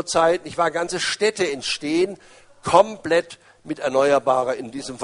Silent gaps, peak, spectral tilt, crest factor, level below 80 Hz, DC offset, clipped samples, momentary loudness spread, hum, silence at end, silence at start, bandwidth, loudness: none; -2 dBFS; -3.5 dB/octave; 20 dB; -60 dBFS; under 0.1%; under 0.1%; 13 LU; none; 0 s; 0 s; 10.5 kHz; -21 LUFS